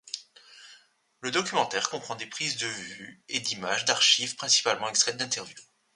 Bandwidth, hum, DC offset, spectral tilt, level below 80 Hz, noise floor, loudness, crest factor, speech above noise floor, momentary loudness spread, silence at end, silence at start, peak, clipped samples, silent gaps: 11.5 kHz; none; under 0.1%; -0.5 dB/octave; -76 dBFS; -59 dBFS; -26 LUFS; 26 dB; 30 dB; 17 LU; 0.3 s; 0.05 s; -4 dBFS; under 0.1%; none